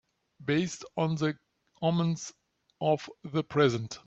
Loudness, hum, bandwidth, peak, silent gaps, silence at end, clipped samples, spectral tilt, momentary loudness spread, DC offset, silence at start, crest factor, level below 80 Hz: -30 LUFS; none; 8.2 kHz; -10 dBFS; none; 0.1 s; under 0.1%; -6 dB/octave; 10 LU; under 0.1%; 0.4 s; 20 dB; -68 dBFS